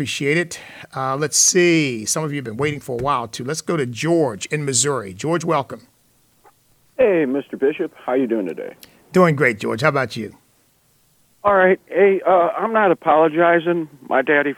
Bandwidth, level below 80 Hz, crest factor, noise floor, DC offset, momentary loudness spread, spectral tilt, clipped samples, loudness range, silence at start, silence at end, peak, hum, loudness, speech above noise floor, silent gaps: 17.5 kHz; -58 dBFS; 18 dB; -59 dBFS; under 0.1%; 12 LU; -4 dB/octave; under 0.1%; 5 LU; 0 s; 0.05 s; -2 dBFS; none; -18 LUFS; 41 dB; none